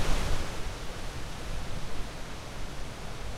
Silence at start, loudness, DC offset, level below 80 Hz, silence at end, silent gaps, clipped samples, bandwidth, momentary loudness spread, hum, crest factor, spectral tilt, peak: 0 s; -38 LUFS; under 0.1%; -34 dBFS; 0 s; none; under 0.1%; 13.5 kHz; 7 LU; none; 18 dB; -4 dB/octave; -12 dBFS